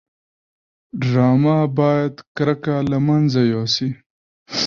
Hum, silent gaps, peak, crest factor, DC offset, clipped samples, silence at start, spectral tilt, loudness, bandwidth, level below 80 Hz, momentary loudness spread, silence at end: none; 2.27-2.35 s, 4.06-4.46 s; -4 dBFS; 16 dB; under 0.1%; under 0.1%; 0.95 s; -6.5 dB/octave; -18 LUFS; 7.2 kHz; -54 dBFS; 11 LU; 0 s